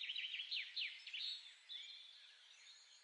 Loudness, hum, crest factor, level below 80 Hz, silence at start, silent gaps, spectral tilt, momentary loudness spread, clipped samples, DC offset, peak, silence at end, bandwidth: -46 LUFS; none; 18 dB; under -90 dBFS; 0 s; none; 7 dB/octave; 17 LU; under 0.1%; under 0.1%; -32 dBFS; 0 s; 11 kHz